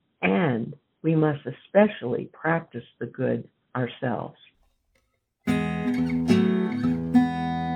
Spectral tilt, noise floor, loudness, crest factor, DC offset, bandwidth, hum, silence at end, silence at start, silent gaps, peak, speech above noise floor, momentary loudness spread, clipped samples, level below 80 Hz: -8 dB/octave; -71 dBFS; -25 LUFS; 18 dB; under 0.1%; 11 kHz; none; 0 s; 0.2 s; none; -6 dBFS; 45 dB; 13 LU; under 0.1%; -54 dBFS